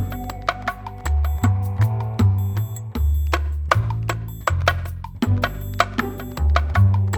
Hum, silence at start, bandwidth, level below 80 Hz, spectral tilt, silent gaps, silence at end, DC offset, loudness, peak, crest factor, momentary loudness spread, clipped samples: none; 0 s; 18.5 kHz; -28 dBFS; -6 dB/octave; none; 0 s; under 0.1%; -22 LUFS; 0 dBFS; 20 dB; 9 LU; under 0.1%